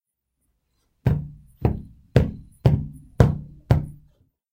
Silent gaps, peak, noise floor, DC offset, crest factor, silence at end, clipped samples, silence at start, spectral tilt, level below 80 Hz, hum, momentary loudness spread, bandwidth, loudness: none; 0 dBFS; -75 dBFS; under 0.1%; 24 dB; 0.6 s; under 0.1%; 1.05 s; -9 dB/octave; -34 dBFS; none; 14 LU; 15.5 kHz; -24 LUFS